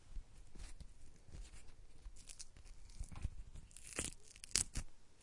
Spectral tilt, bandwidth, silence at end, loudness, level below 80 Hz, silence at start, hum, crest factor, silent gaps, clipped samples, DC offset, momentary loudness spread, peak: -1.5 dB/octave; 11.5 kHz; 0 s; -45 LUFS; -54 dBFS; 0 s; none; 36 dB; none; under 0.1%; under 0.1%; 24 LU; -12 dBFS